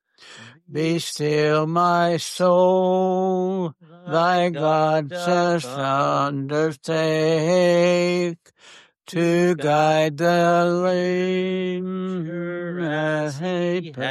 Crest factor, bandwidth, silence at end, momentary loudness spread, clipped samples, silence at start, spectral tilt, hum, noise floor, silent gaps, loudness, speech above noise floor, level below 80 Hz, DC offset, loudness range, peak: 14 dB; 13 kHz; 0 s; 9 LU; under 0.1%; 0.25 s; -6 dB/octave; none; -45 dBFS; none; -21 LUFS; 24 dB; -70 dBFS; under 0.1%; 2 LU; -8 dBFS